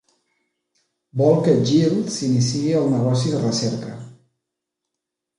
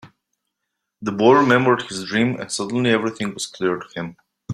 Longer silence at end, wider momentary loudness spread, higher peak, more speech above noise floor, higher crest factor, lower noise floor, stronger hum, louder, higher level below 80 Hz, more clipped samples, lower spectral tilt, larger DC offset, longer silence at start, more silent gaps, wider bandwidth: first, 1.25 s vs 0 s; about the same, 13 LU vs 15 LU; about the same, -4 dBFS vs -2 dBFS; first, 64 dB vs 60 dB; about the same, 18 dB vs 18 dB; first, -83 dBFS vs -79 dBFS; neither; about the same, -19 LUFS vs -19 LUFS; about the same, -60 dBFS vs -60 dBFS; neither; first, -6.5 dB/octave vs -5 dB/octave; neither; first, 1.15 s vs 0.05 s; neither; second, 11 kHz vs 13 kHz